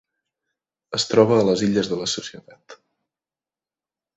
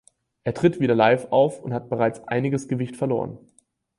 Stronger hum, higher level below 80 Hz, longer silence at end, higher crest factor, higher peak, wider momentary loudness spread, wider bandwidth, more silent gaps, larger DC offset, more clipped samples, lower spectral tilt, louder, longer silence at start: neither; about the same, -60 dBFS vs -60 dBFS; first, 1.4 s vs 0.6 s; about the same, 22 dB vs 20 dB; about the same, -2 dBFS vs -4 dBFS; about the same, 12 LU vs 12 LU; second, 8.2 kHz vs 11.5 kHz; neither; neither; neither; second, -4.5 dB/octave vs -7 dB/octave; first, -20 LUFS vs -23 LUFS; first, 0.9 s vs 0.45 s